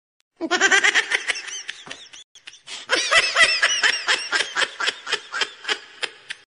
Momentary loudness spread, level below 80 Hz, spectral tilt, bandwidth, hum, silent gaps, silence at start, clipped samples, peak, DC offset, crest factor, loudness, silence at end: 19 LU; -62 dBFS; 1 dB/octave; 11 kHz; none; 2.24-2.35 s; 0.4 s; under 0.1%; -4 dBFS; under 0.1%; 20 dB; -19 LUFS; 0.2 s